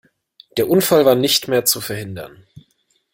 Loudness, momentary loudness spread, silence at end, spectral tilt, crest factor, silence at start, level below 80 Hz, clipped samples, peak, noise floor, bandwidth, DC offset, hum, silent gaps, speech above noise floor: -16 LUFS; 18 LU; 0.85 s; -3.5 dB/octave; 18 dB; 0.55 s; -56 dBFS; under 0.1%; 0 dBFS; -64 dBFS; 17 kHz; under 0.1%; none; none; 48 dB